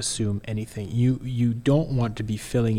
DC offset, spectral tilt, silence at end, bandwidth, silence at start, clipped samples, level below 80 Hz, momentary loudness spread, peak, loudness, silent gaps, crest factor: under 0.1%; -6 dB/octave; 0 s; 15 kHz; 0 s; under 0.1%; -44 dBFS; 8 LU; -8 dBFS; -25 LUFS; none; 16 dB